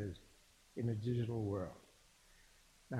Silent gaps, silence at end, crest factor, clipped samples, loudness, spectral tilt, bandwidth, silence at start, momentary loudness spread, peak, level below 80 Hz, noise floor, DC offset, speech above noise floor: none; 0 s; 14 dB; under 0.1%; -42 LUFS; -8 dB/octave; 12.5 kHz; 0 s; 16 LU; -28 dBFS; -66 dBFS; -67 dBFS; under 0.1%; 28 dB